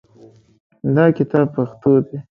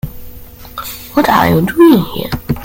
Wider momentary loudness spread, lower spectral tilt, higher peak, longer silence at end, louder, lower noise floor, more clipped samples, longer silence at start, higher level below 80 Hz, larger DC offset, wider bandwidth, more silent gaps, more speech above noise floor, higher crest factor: second, 5 LU vs 18 LU; first, -11 dB/octave vs -6.5 dB/octave; about the same, 0 dBFS vs 0 dBFS; first, 0.15 s vs 0 s; second, -17 LUFS vs -11 LUFS; first, -47 dBFS vs -32 dBFS; neither; first, 0.85 s vs 0.05 s; second, -58 dBFS vs -34 dBFS; neither; second, 5.4 kHz vs 17 kHz; neither; first, 31 dB vs 22 dB; first, 18 dB vs 12 dB